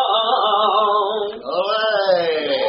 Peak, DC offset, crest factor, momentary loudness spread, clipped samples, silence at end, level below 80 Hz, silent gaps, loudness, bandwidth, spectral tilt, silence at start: -4 dBFS; under 0.1%; 14 dB; 7 LU; under 0.1%; 0 s; -68 dBFS; none; -18 LUFS; 5.8 kHz; 0.5 dB/octave; 0 s